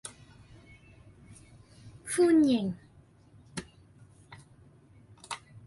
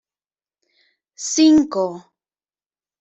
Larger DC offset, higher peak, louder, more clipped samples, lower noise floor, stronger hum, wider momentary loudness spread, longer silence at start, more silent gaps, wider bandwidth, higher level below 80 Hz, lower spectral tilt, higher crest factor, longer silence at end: neither; second, -16 dBFS vs -4 dBFS; second, -28 LUFS vs -17 LUFS; neither; second, -58 dBFS vs under -90 dBFS; neither; first, 30 LU vs 16 LU; second, 0.05 s vs 1.2 s; neither; first, 11.5 kHz vs 8 kHz; second, -64 dBFS vs -58 dBFS; first, -5 dB/octave vs -3.5 dB/octave; about the same, 18 dB vs 18 dB; second, 0.05 s vs 1 s